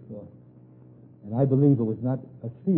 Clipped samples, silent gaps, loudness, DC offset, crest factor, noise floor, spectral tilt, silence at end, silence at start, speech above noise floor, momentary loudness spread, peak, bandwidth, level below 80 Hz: under 0.1%; none; -24 LUFS; under 0.1%; 16 dB; -51 dBFS; -14.5 dB/octave; 0 s; 0.1 s; 27 dB; 22 LU; -10 dBFS; 2 kHz; -64 dBFS